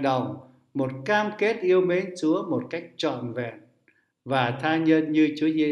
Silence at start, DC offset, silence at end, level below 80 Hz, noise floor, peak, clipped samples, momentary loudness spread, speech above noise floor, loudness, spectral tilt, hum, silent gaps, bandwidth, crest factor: 0 s; under 0.1%; 0 s; -72 dBFS; -66 dBFS; -6 dBFS; under 0.1%; 13 LU; 42 dB; -25 LUFS; -6.5 dB/octave; none; none; 10 kHz; 18 dB